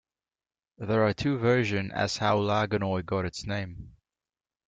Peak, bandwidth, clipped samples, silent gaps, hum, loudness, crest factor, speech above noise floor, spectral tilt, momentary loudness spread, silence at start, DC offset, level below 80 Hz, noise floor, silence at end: -12 dBFS; 9.2 kHz; under 0.1%; none; none; -28 LUFS; 18 dB; over 63 dB; -6 dB/octave; 10 LU; 0.8 s; under 0.1%; -56 dBFS; under -90 dBFS; 0.8 s